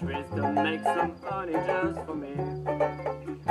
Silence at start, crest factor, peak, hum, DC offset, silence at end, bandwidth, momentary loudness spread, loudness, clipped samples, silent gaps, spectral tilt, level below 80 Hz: 0 s; 16 dB; -12 dBFS; none; under 0.1%; 0 s; 12.5 kHz; 8 LU; -30 LUFS; under 0.1%; none; -7 dB/octave; -54 dBFS